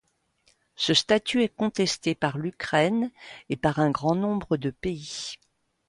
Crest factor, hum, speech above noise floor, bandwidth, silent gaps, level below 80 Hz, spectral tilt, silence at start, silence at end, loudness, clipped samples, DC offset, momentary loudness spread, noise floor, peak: 20 dB; none; 41 dB; 11.5 kHz; none; -56 dBFS; -4.5 dB/octave; 0.8 s; 0.55 s; -26 LUFS; under 0.1%; under 0.1%; 12 LU; -67 dBFS; -8 dBFS